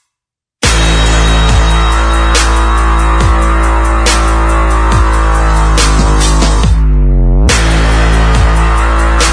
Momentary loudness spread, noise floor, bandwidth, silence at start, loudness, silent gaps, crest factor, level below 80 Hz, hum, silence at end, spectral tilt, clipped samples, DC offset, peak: 2 LU; -81 dBFS; 10.5 kHz; 0.6 s; -10 LUFS; none; 8 dB; -10 dBFS; none; 0 s; -4.5 dB/octave; under 0.1%; under 0.1%; 0 dBFS